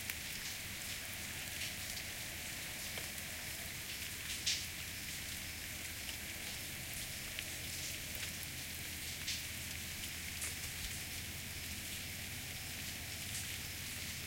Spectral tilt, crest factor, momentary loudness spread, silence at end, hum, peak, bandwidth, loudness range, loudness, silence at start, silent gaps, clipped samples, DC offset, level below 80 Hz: -1.5 dB/octave; 24 dB; 3 LU; 0 s; none; -20 dBFS; 17 kHz; 1 LU; -42 LUFS; 0 s; none; under 0.1%; under 0.1%; -60 dBFS